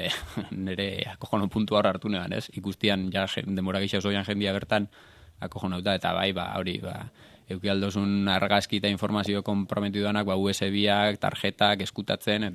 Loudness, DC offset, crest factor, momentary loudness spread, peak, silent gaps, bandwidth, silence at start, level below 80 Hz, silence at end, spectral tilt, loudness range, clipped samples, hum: -27 LUFS; under 0.1%; 22 dB; 10 LU; -6 dBFS; none; 14 kHz; 0 s; -60 dBFS; 0 s; -5.5 dB/octave; 4 LU; under 0.1%; none